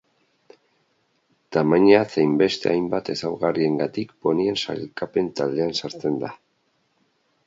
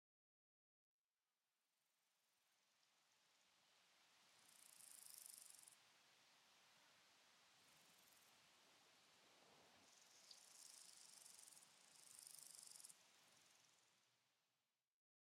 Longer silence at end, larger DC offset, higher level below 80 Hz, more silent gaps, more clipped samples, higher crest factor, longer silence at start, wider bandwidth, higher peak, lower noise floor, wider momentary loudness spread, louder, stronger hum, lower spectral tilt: first, 1.1 s vs 0.6 s; neither; first, -62 dBFS vs under -90 dBFS; neither; neither; second, 22 dB vs 28 dB; about the same, 1.5 s vs 1.5 s; second, 7.8 kHz vs 16 kHz; first, -2 dBFS vs -44 dBFS; second, -68 dBFS vs under -90 dBFS; first, 11 LU vs 8 LU; first, -22 LUFS vs -63 LUFS; neither; first, -6 dB/octave vs 1 dB/octave